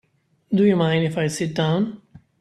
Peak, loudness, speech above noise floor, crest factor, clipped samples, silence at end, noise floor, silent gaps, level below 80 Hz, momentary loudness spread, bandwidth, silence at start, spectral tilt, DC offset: -6 dBFS; -21 LUFS; 39 dB; 16 dB; under 0.1%; 0.45 s; -58 dBFS; none; -60 dBFS; 7 LU; 12.5 kHz; 0.5 s; -6.5 dB/octave; under 0.1%